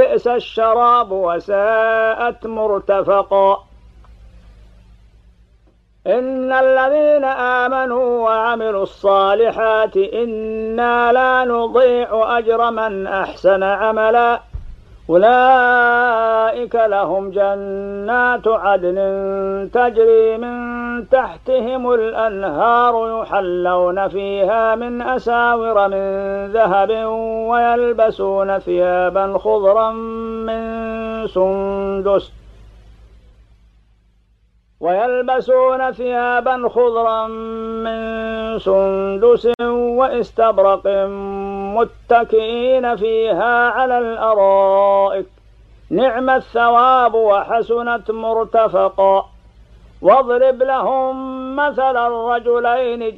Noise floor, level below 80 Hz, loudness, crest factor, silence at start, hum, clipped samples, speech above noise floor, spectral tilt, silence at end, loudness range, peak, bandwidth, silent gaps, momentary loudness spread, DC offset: -56 dBFS; -46 dBFS; -16 LUFS; 16 dB; 0 s; 60 Hz at -55 dBFS; under 0.1%; 40 dB; -7 dB/octave; 0 s; 5 LU; 0 dBFS; 6.2 kHz; none; 9 LU; under 0.1%